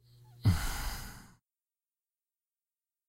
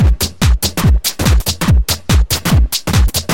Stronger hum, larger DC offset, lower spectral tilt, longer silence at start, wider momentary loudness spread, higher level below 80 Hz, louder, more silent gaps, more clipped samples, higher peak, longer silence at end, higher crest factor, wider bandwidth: neither; second, under 0.1% vs 1%; about the same, -5 dB/octave vs -4.5 dB/octave; first, 0.4 s vs 0 s; first, 18 LU vs 1 LU; second, -44 dBFS vs -14 dBFS; second, -34 LUFS vs -14 LUFS; neither; neither; second, -18 dBFS vs 0 dBFS; first, 1.85 s vs 0 s; first, 20 dB vs 12 dB; about the same, 16 kHz vs 17 kHz